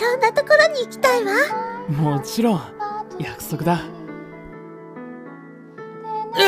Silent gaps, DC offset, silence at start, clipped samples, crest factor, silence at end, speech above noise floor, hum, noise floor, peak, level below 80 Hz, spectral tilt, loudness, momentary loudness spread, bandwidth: none; under 0.1%; 0 s; under 0.1%; 18 dB; 0 s; 20 dB; none; -40 dBFS; -4 dBFS; -56 dBFS; -5 dB/octave; -20 LUFS; 23 LU; 16 kHz